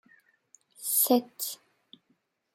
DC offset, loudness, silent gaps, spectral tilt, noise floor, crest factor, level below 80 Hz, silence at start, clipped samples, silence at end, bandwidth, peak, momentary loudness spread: under 0.1%; -27 LUFS; none; -2 dB/octave; -74 dBFS; 22 dB; -88 dBFS; 0.8 s; under 0.1%; 1 s; 16.5 kHz; -10 dBFS; 14 LU